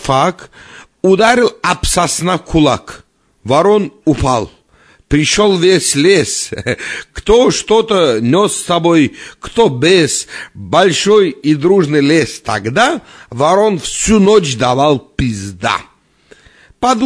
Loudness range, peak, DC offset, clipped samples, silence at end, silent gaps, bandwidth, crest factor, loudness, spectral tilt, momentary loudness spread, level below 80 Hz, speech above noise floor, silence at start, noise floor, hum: 2 LU; 0 dBFS; under 0.1%; under 0.1%; 0 s; none; 11 kHz; 12 dB; -12 LUFS; -4.5 dB/octave; 9 LU; -34 dBFS; 36 dB; 0 s; -48 dBFS; none